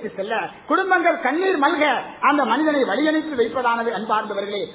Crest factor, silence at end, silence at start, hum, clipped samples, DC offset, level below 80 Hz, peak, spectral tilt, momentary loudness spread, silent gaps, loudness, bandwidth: 16 dB; 0 s; 0 s; none; under 0.1%; under 0.1%; -64 dBFS; -4 dBFS; -8 dB/octave; 7 LU; none; -20 LUFS; 4 kHz